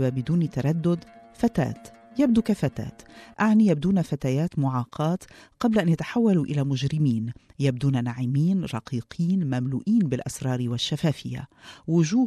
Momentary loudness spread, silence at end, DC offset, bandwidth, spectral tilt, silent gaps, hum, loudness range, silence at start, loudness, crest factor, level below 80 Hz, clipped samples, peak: 10 LU; 0 s; under 0.1%; 13 kHz; -7 dB/octave; none; none; 2 LU; 0 s; -25 LUFS; 16 dB; -54 dBFS; under 0.1%; -8 dBFS